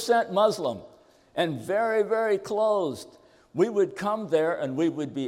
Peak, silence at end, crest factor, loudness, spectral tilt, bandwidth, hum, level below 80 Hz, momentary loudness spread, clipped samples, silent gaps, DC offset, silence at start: -10 dBFS; 0 s; 16 dB; -26 LUFS; -5.5 dB/octave; 16 kHz; none; -70 dBFS; 9 LU; under 0.1%; none; under 0.1%; 0 s